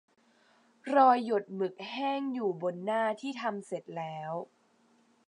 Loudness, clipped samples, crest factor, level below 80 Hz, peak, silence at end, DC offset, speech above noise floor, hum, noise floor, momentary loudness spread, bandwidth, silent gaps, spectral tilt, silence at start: -31 LUFS; under 0.1%; 22 dB; -90 dBFS; -10 dBFS; 0.85 s; under 0.1%; 37 dB; none; -67 dBFS; 15 LU; 10.5 kHz; none; -6 dB/octave; 0.85 s